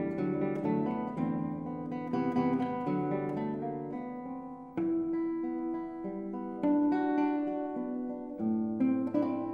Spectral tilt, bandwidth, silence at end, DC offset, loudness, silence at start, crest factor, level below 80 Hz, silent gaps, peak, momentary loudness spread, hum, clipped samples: -10 dB/octave; 5.2 kHz; 0 s; under 0.1%; -33 LUFS; 0 s; 14 dB; -68 dBFS; none; -18 dBFS; 9 LU; none; under 0.1%